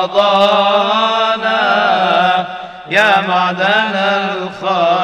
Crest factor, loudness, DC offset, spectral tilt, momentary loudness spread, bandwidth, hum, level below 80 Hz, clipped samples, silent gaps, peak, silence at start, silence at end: 12 dB; -13 LUFS; under 0.1%; -4.5 dB/octave; 7 LU; 11.5 kHz; none; -58 dBFS; under 0.1%; none; 0 dBFS; 0 s; 0 s